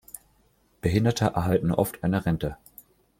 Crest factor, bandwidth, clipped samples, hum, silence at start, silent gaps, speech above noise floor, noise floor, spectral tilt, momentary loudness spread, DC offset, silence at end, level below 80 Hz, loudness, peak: 20 dB; 16.5 kHz; under 0.1%; none; 0.85 s; none; 40 dB; -64 dBFS; -6.5 dB/octave; 18 LU; under 0.1%; 0.65 s; -48 dBFS; -26 LUFS; -8 dBFS